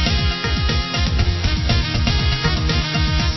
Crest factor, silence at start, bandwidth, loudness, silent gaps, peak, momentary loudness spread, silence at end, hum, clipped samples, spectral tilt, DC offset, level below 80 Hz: 14 dB; 0 s; 6.2 kHz; -19 LUFS; none; -4 dBFS; 2 LU; 0 s; none; under 0.1%; -5 dB/octave; under 0.1%; -22 dBFS